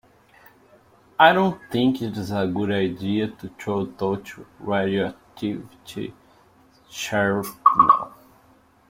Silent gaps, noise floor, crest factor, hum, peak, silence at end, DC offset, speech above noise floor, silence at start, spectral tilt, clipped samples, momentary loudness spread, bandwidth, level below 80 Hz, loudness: none; -56 dBFS; 22 dB; none; -2 dBFS; 0.8 s; under 0.1%; 34 dB; 1.2 s; -5.5 dB/octave; under 0.1%; 19 LU; 16.5 kHz; -60 dBFS; -22 LUFS